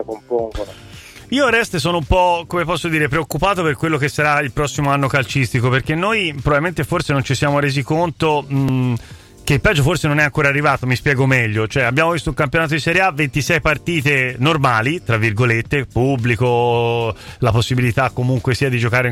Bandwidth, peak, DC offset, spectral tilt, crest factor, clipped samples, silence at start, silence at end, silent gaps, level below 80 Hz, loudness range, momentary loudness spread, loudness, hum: 15.5 kHz; -2 dBFS; under 0.1%; -5.5 dB/octave; 16 dB; under 0.1%; 0 s; 0 s; none; -36 dBFS; 2 LU; 5 LU; -17 LUFS; none